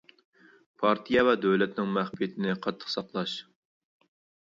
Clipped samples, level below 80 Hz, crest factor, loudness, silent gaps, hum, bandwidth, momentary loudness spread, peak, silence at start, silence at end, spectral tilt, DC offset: under 0.1%; -66 dBFS; 20 dB; -28 LUFS; none; none; 7.6 kHz; 10 LU; -8 dBFS; 0.8 s; 1.1 s; -6.5 dB/octave; under 0.1%